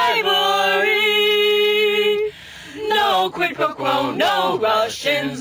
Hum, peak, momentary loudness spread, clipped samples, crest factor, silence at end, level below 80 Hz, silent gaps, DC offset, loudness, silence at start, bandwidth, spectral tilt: none; -6 dBFS; 6 LU; under 0.1%; 12 dB; 0 s; -58 dBFS; none; under 0.1%; -17 LUFS; 0 s; over 20 kHz; -2.5 dB/octave